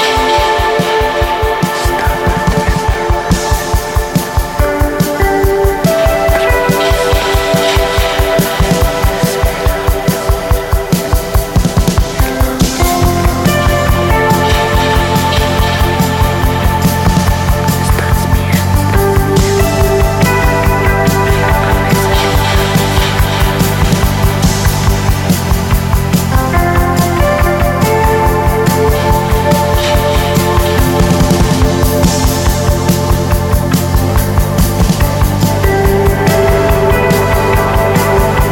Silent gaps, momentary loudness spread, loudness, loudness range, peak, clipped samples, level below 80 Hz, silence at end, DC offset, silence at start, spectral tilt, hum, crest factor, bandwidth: none; 3 LU; -11 LUFS; 2 LU; 0 dBFS; under 0.1%; -16 dBFS; 0 s; under 0.1%; 0 s; -5 dB/octave; none; 10 dB; 17 kHz